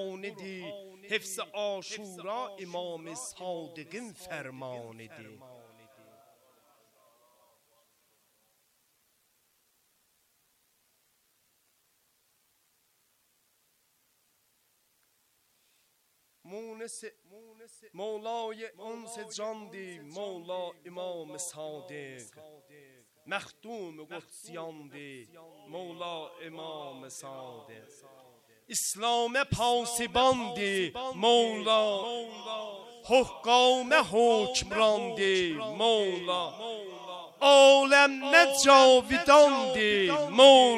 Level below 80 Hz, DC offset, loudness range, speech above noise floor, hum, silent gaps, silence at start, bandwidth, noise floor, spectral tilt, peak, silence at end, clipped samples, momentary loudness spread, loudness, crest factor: -64 dBFS; under 0.1%; 22 LU; 44 dB; none; none; 0 s; 15 kHz; -72 dBFS; -2.5 dB/octave; -4 dBFS; 0 s; under 0.1%; 25 LU; -25 LUFS; 24 dB